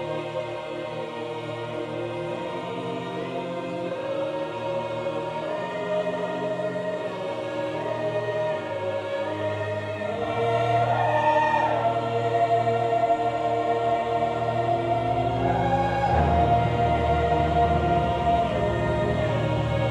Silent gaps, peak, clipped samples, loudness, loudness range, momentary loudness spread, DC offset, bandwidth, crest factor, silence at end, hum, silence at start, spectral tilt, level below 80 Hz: none; -10 dBFS; under 0.1%; -25 LUFS; 8 LU; 9 LU; under 0.1%; 10.5 kHz; 16 dB; 0 s; none; 0 s; -7 dB/octave; -40 dBFS